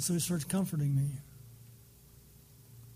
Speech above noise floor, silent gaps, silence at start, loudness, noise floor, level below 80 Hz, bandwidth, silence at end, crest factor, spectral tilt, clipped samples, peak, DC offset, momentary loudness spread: 26 dB; none; 0 s; -33 LUFS; -58 dBFS; -62 dBFS; 15.5 kHz; 0 s; 18 dB; -5.5 dB/octave; under 0.1%; -18 dBFS; under 0.1%; 24 LU